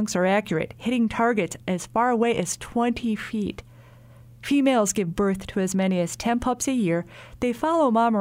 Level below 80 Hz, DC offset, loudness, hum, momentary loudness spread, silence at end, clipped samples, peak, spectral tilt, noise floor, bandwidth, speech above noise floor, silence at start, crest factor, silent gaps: -50 dBFS; under 0.1%; -24 LUFS; none; 8 LU; 0 s; under 0.1%; -8 dBFS; -5 dB/octave; -48 dBFS; 16 kHz; 25 dB; 0 s; 16 dB; none